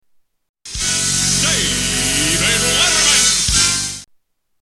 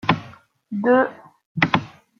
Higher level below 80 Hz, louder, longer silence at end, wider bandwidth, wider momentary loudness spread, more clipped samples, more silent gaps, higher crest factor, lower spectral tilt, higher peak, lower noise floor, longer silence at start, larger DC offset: first, -34 dBFS vs -56 dBFS; first, -13 LUFS vs -21 LUFS; first, 0.6 s vs 0.3 s; first, 14 kHz vs 6.8 kHz; about the same, 10 LU vs 12 LU; neither; second, none vs 1.46-1.55 s; second, 16 dB vs 22 dB; second, -1 dB/octave vs -7 dB/octave; about the same, 0 dBFS vs -2 dBFS; first, -59 dBFS vs -46 dBFS; first, 0.65 s vs 0.05 s; neither